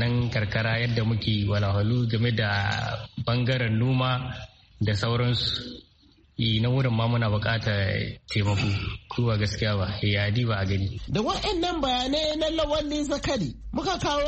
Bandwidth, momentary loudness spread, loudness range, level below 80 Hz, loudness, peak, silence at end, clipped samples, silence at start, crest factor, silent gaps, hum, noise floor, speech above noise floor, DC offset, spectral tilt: 8.4 kHz; 6 LU; 1 LU; -44 dBFS; -26 LUFS; -10 dBFS; 0 s; under 0.1%; 0 s; 14 dB; none; none; -58 dBFS; 33 dB; under 0.1%; -6 dB/octave